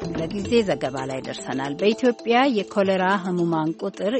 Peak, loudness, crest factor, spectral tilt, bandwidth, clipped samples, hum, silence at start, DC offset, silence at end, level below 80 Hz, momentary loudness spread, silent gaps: -4 dBFS; -23 LUFS; 18 dB; -5.5 dB/octave; 8.8 kHz; under 0.1%; none; 0 s; under 0.1%; 0 s; -54 dBFS; 9 LU; none